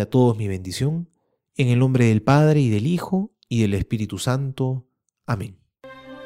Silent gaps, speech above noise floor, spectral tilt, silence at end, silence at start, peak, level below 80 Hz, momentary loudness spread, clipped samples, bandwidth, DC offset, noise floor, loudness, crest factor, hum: none; 24 dB; -7 dB/octave; 0 s; 0 s; -4 dBFS; -46 dBFS; 15 LU; under 0.1%; 15 kHz; under 0.1%; -44 dBFS; -21 LUFS; 18 dB; none